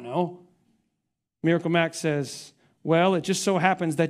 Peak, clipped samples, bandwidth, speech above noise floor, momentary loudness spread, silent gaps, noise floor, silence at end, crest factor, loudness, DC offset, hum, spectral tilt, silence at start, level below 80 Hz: -4 dBFS; under 0.1%; 15 kHz; 57 dB; 11 LU; none; -81 dBFS; 0 s; 22 dB; -24 LUFS; under 0.1%; none; -5 dB/octave; 0 s; -70 dBFS